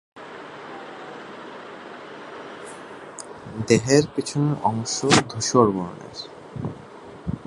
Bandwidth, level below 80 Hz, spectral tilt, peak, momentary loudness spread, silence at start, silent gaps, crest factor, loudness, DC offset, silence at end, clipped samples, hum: 11.5 kHz; -52 dBFS; -4.5 dB/octave; 0 dBFS; 20 LU; 0.15 s; none; 24 dB; -22 LUFS; under 0.1%; 0 s; under 0.1%; none